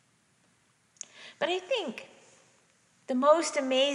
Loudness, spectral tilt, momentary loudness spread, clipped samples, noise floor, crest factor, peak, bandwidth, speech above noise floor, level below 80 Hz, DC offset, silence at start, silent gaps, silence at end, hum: -28 LUFS; -2 dB/octave; 21 LU; under 0.1%; -68 dBFS; 22 dB; -10 dBFS; 11 kHz; 41 dB; -90 dBFS; under 0.1%; 1.15 s; none; 0 s; none